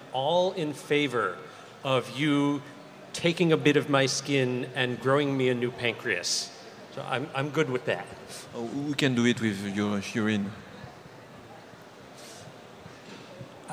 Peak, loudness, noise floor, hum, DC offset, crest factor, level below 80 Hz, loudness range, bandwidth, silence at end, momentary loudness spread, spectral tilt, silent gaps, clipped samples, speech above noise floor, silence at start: -8 dBFS; -27 LUFS; -48 dBFS; none; under 0.1%; 22 dB; -70 dBFS; 8 LU; 16 kHz; 0 s; 22 LU; -4.5 dB/octave; none; under 0.1%; 21 dB; 0 s